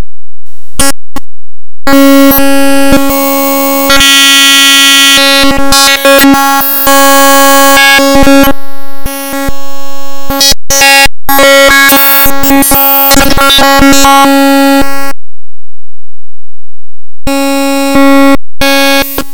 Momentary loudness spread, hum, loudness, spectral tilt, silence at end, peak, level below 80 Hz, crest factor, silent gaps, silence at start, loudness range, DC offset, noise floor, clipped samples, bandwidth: 15 LU; none; -3 LUFS; -2 dB/octave; 0.1 s; 0 dBFS; -24 dBFS; 4 dB; none; 0 s; 8 LU; under 0.1%; -85 dBFS; 7%; over 20 kHz